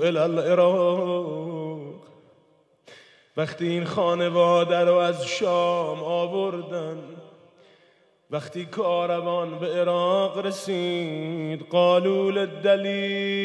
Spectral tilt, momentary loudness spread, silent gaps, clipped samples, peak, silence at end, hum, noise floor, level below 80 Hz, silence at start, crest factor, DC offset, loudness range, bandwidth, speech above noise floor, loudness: -5.5 dB/octave; 13 LU; none; under 0.1%; -8 dBFS; 0 s; none; -61 dBFS; -84 dBFS; 0 s; 16 dB; under 0.1%; 7 LU; 11 kHz; 38 dB; -24 LUFS